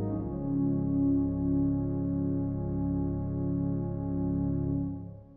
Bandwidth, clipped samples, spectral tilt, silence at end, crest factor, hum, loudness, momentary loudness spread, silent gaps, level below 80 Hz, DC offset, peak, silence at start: 1.8 kHz; under 0.1%; -15 dB/octave; 0 s; 12 dB; none; -31 LUFS; 5 LU; none; -44 dBFS; under 0.1%; -18 dBFS; 0 s